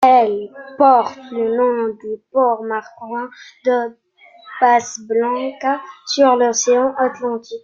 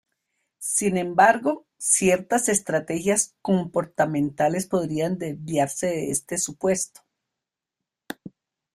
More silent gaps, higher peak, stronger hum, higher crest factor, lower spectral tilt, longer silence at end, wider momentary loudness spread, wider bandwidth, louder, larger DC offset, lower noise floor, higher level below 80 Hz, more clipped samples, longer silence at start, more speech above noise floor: neither; first, 0 dBFS vs -4 dBFS; neither; second, 16 dB vs 22 dB; second, -2.5 dB/octave vs -4 dB/octave; second, 0.05 s vs 0.45 s; first, 14 LU vs 10 LU; second, 7.4 kHz vs 15.5 kHz; first, -17 LUFS vs -23 LUFS; neither; second, -41 dBFS vs -87 dBFS; about the same, -66 dBFS vs -62 dBFS; neither; second, 0 s vs 0.6 s; second, 24 dB vs 63 dB